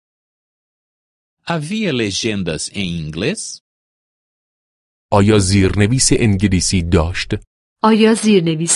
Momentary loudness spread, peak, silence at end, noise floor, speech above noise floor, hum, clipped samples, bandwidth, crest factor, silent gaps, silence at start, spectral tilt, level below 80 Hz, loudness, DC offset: 11 LU; 0 dBFS; 0 s; under -90 dBFS; over 75 dB; none; under 0.1%; 11.5 kHz; 16 dB; 3.61-5.09 s, 7.47-7.76 s; 1.45 s; -4.5 dB/octave; -32 dBFS; -15 LUFS; under 0.1%